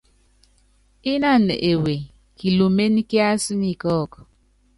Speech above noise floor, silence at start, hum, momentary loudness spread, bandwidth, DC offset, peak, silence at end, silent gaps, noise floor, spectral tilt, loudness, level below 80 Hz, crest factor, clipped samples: 39 dB; 1.05 s; none; 12 LU; 11.5 kHz; under 0.1%; -6 dBFS; 0.55 s; none; -58 dBFS; -5.5 dB/octave; -20 LUFS; -50 dBFS; 16 dB; under 0.1%